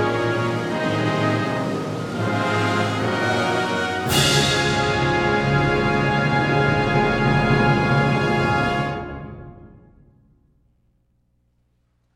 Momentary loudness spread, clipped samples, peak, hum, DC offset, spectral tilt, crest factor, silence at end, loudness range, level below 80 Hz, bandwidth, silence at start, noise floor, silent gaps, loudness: 7 LU; under 0.1%; -4 dBFS; 60 Hz at -55 dBFS; under 0.1%; -5 dB/octave; 18 dB; 2.5 s; 6 LU; -40 dBFS; 16 kHz; 0 s; -66 dBFS; none; -20 LUFS